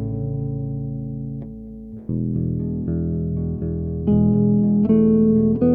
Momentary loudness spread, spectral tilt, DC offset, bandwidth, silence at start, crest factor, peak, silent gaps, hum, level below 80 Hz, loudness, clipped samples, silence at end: 15 LU; -14.5 dB/octave; under 0.1%; 2.6 kHz; 0 s; 14 dB; -6 dBFS; none; none; -38 dBFS; -21 LUFS; under 0.1%; 0 s